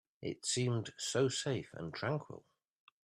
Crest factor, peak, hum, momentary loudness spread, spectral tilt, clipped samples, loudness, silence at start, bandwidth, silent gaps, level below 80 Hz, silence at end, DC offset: 18 dB; -20 dBFS; none; 11 LU; -4 dB/octave; under 0.1%; -37 LUFS; 0.2 s; 13.5 kHz; none; -74 dBFS; 0.65 s; under 0.1%